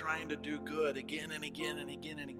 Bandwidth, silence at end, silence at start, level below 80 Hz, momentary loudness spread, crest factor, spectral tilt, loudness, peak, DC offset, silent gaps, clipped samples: 16 kHz; 0 s; 0 s; -70 dBFS; 7 LU; 18 dB; -4 dB/octave; -39 LUFS; -22 dBFS; under 0.1%; none; under 0.1%